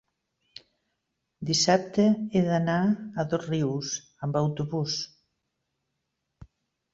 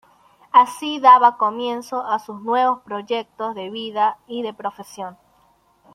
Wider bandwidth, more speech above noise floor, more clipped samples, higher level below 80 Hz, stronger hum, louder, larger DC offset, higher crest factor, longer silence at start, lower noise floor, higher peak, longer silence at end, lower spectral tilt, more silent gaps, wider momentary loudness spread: second, 8 kHz vs 12.5 kHz; first, 55 dB vs 39 dB; neither; first, -62 dBFS vs -72 dBFS; neither; second, -26 LUFS vs -19 LUFS; neither; about the same, 20 dB vs 18 dB; first, 1.4 s vs 0.55 s; first, -81 dBFS vs -59 dBFS; second, -8 dBFS vs -2 dBFS; second, 0.5 s vs 0.8 s; first, -5 dB/octave vs -3.5 dB/octave; neither; second, 10 LU vs 18 LU